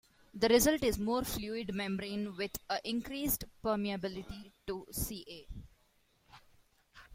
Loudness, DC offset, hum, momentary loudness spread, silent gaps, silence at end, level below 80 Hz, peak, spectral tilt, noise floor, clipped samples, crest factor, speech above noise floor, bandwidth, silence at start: -34 LUFS; under 0.1%; none; 19 LU; none; 0 s; -52 dBFS; -14 dBFS; -4 dB/octave; -71 dBFS; under 0.1%; 22 dB; 37 dB; 16.5 kHz; 0.35 s